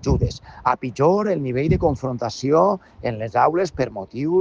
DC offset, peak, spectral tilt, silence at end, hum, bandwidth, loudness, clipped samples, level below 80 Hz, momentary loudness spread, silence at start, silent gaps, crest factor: under 0.1%; -4 dBFS; -7 dB/octave; 0 s; none; 7.8 kHz; -21 LUFS; under 0.1%; -36 dBFS; 9 LU; 0 s; none; 16 dB